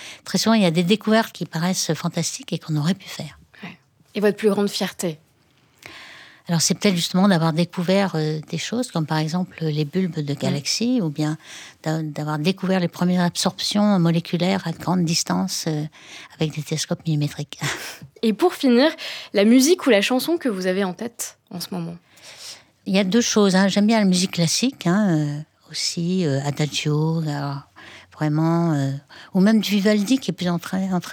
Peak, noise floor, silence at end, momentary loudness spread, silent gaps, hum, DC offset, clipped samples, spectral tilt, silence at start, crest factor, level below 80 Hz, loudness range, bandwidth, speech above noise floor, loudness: -2 dBFS; -59 dBFS; 0 s; 15 LU; none; none; under 0.1%; under 0.1%; -5 dB/octave; 0 s; 18 dB; -66 dBFS; 5 LU; 19 kHz; 38 dB; -21 LUFS